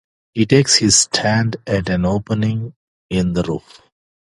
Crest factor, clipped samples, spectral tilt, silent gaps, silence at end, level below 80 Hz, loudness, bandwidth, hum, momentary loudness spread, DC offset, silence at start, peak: 18 dB; under 0.1%; -4 dB/octave; 2.76-3.09 s; 0.7 s; -40 dBFS; -16 LUFS; 11.5 kHz; none; 14 LU; under 0.1%; 0.35 s; 0 dBFS